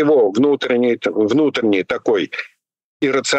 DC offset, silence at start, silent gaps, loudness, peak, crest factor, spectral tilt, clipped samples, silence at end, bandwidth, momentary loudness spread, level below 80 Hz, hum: under 0.1%; 0 s; 2.84-3.00 s; -17 LUFS; -6 dBFS; 10 dB; -4.5 dB/octave; under 0.1%; 0 s; 9.2 kHz; 9 LU; -62 dBFS; none